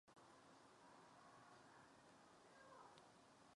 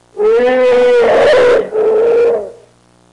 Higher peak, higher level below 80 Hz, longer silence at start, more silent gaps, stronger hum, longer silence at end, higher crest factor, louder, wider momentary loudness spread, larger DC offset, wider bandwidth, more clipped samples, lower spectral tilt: second, -46 dBFS vs -4 dBFS; second, under -90 dBFS vs -46 dBFS; about the same, 0.05 s vs 0.15 s; neither; neither; second, 0 s vs 0.6 s; first, 22 dB vs 6 dB; second, -67 LUFS vs -10 LUFS; about the same, 4 LU vs 6 LU; neither; about the same, 11 kHz vs 10.5 kHz; neither; about the same, -3.5 dB/octave vs -4.5 dB/octave